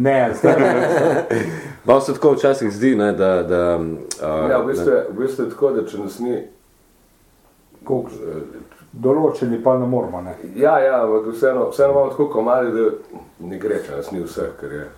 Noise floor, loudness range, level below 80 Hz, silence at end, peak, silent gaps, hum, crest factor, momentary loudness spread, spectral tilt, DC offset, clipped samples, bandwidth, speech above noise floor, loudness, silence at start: -54 dBFS; 8 LU; -52 dBFS; 0.05 s; 0 dBFS; none; none; 18 dB; 12 LU; -6.5 dB/octave; under 0.1%; under 0.1%; 16 kHz; 36 dB; -18 LUFS; 0 s